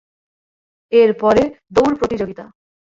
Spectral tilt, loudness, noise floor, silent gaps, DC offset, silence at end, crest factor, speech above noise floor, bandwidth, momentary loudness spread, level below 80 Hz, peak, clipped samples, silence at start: -6 dB/octave; -16 LUFS; under -90 dBFS; none; under 0.1%; 0.55 s; 16 dB; over 75 dB; 7.6 kHz; 12 LU; -46 dBFS; -2 dBFS; under 0.1%; 0.9 s